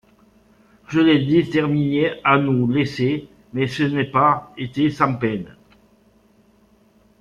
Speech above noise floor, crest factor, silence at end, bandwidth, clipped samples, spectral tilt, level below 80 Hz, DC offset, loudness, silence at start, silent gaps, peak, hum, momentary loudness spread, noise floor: 37 dB; 18 dB; 1.75 s; 9.4 kHz; under 0.1%; -7.5 dB/octave; -56 dBFS; under 0.1%; -19 LUFS; 0.9 s; none; -4 dBFS; none; 9 LU; -56 dBFS